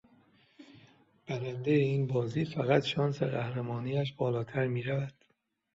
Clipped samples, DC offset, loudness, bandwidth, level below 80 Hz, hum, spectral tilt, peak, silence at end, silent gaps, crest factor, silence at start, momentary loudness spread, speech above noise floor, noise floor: under 0.1%; under 0.1%; -32 LUFS; 7.8 kHz; -68 dBFS; none; -7.5 dB/octave; -12 dBFS; 0.65 s; none; 22 dB; 0.6 s; 8 LU; 44 dB; -75 dBFS